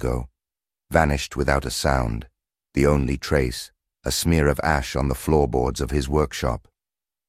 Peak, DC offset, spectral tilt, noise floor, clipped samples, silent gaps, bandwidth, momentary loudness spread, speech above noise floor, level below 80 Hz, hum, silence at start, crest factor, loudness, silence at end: -2 dBFS; under 0.1%; -5.5 dB/octave; under -90 dBFS; under 0.1%; none; 16 kHz; 10 LU; over 68 dB; -32 dBFS; none; 0 s; 22 dB; -23 LUFS; 0.7 s